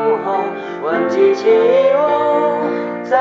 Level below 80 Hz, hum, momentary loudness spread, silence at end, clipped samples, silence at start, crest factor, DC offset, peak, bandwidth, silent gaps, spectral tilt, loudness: -66 dBFS; none; 9 LU; 0 s; under 0.1%; 0 s; 12 dB; under 0.1%; -2 dBFS; 7.4 kHz; none; -3.5 dB/octave; -15 LUFS